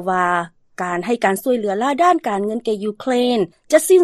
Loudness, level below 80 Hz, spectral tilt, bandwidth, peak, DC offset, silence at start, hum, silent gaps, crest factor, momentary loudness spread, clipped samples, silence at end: -19 LUFS; -64 dBFS; -4.5 dB/octave; 13.5 kHz; 0 dBFS; under 0.1%; 0 s; none; none; 16 dB; 7 LU; under 0.1%; 0 s